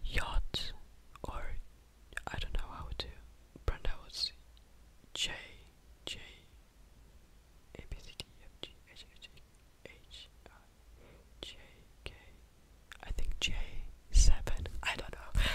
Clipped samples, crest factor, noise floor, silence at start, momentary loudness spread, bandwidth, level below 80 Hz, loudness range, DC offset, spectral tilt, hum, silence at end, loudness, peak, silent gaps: under 0.1%; 26 dB; -60 dBFS; 0 s; 23 LU; 13.5 kHz; -38 dBFS; 16 LU; under 0.1%; -2.5 dB/octave; none; 0 s; -40 LUFS; -10 dBFS; none